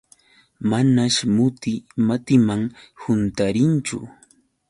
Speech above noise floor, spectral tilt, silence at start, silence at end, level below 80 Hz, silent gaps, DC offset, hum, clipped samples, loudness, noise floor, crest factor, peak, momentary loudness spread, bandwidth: 37 dB; -5.5 dB/octave; 0.6 s; 0.6 s; -52 dBFS; none; under 0.1%; none; under 0.1%; -20 LUFS; -57 dBFS; 18 dB; -4 dBFS; 11 LU; 11.5 kHz